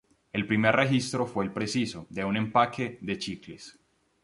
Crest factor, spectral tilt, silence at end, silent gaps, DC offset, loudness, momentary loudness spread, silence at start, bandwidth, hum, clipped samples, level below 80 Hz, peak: 24 dB; -5.5 dB/octave; 0.55 s; none; under 0.1%; -28 LUFS; 15 LU; 0.35 s; 11.5 kHz; none; under 0.1%; -60 dBFS; -6 dBFS